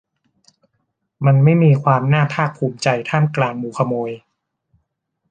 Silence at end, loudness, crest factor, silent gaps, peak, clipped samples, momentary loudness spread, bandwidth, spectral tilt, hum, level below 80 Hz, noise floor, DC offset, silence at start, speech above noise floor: 1.15 s; -17 LUFS; 18 dB; none; 0 dBFS; under 0.1%; 9 LU; 9 kHz; -7.5 dB/octave; none; -58 dBFS; -73 dBFS; under 0.1%; 1.2 s; 57 dB